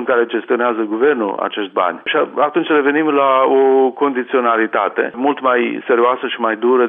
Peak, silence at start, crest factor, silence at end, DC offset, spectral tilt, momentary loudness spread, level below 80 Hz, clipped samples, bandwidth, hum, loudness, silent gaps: -2 dBFS; 0 s; 12 dB; 0 s; under 0.1%; -8.5 dB/octave; 6 LU; -76 dBFS; under 0.1%; 3.8 kHz; none; -15 LUFS; none